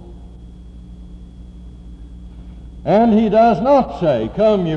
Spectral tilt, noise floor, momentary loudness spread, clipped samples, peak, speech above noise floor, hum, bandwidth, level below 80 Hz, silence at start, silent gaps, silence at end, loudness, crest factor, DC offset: -8.5 dB/octave; -37 dBFS; 25 LU; under 0.1%; -4 dBFS; 23 dB; none; 7 kHz; -38 dBFS; 0 s; none; 0 s; -15 LUFS; 14 dB; under 0.1%